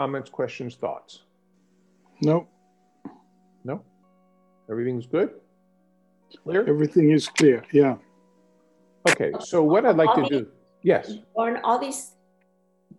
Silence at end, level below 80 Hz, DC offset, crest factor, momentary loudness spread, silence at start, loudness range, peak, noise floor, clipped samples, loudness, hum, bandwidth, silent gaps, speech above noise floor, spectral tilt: 0.9 s; -70 dBFS; under 0.1%; 20 dB; 17 LU; 0 s; 11 LU; -4 dBFS; -65 dBFS; under 0.1%; -23 LUFS; none; 12.5 kHz; none; 43 dB; -5.5 dB/octave